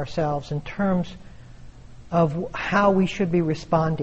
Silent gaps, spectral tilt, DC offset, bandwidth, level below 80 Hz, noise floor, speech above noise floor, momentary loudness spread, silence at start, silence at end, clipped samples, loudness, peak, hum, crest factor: none; -7.5 dB/octave; under 0.1%; 8.2 kHz; -46 dBFS; -42 dBFS; 20 dB; 9 LU; 0 s; 0 s; under 0.1%; -23 LUFS; -8 dBFS; none; 16 dB